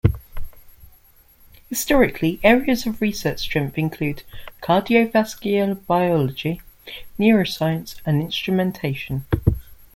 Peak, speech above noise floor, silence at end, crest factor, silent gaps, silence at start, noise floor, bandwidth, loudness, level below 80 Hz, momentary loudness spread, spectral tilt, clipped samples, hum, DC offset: -2 dBFS; 32 dB; 0.2 s; 20 dB; none; 0.05 s; -52 dBFS; 16.5 kHz; -21 LUFS; -38 dBFS; 16 LU; -6 dB/octave; under 0.1%; none; under 0.1%